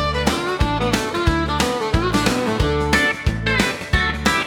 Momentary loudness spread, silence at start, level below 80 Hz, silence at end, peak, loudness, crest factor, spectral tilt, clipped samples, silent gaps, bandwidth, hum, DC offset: 3 LU; 0 s; -28 dBFS; 0 s; -2 dBFS; -19 LUFS; 18 dB; -4.5 dB/octave; under 0.1%; none; 18 kHz; none; under 0.1%